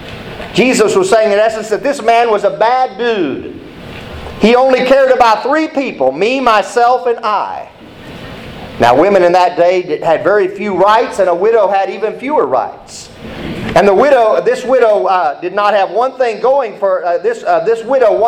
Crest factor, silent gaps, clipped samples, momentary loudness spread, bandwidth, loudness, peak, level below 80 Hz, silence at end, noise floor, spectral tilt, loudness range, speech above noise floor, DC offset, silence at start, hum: 12 dB; none; under 0.1%; 18 LU; 14.5 kHz; -11 LUFS; 0 dBFS; -42 dBFS; 0 s; -31 dBFS; -4.5 dB/octave; 3 LU; 21 dB; under 0.1%; 0 s; none